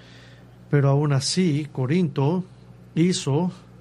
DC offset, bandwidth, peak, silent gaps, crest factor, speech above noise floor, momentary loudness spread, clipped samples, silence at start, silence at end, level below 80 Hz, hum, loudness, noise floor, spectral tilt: under 0.1%; 11 kHz; -6 dBFS; none; 16 dB; 25 dB; 9 LU; under 0.1%; 0.7 s; 0.25 s; -58 dBFS; 60 Hz at -40 dBFS; -23 LUFS; -47 dBFS; -6 dB/octave